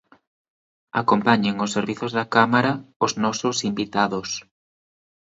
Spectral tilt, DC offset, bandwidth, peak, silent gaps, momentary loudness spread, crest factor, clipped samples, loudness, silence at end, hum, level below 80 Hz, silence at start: -4.5 dB/octave; under 0.1%; 8 kHz; 0 dBFS; 2.96-3.00 s; 8 LU; 22 dB; under 0.1%; -22 LUFS; 1 s; none; -62 dBFS; 0.95 s